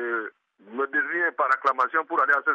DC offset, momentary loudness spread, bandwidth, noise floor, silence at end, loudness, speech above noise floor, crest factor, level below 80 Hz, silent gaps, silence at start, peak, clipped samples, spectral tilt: under 0.1%; 9 LU; 8.6 kHz; -44 dBFS; 0 s; -24 LUFS; 21 dB; 16 dB; -86 dBFS; none; 0 s; -10 dBFS; under 0.1%; -4 dB/octave